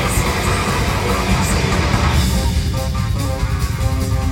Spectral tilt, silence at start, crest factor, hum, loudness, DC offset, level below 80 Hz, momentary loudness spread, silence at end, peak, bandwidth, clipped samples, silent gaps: -5 dB/octave; 0 s; 14 dB; none; -18 LUFS; under 0.1%; -22 dBFS; 4 LU; 0 s; -2 dBFS; 17 kHz; under 0.1%; none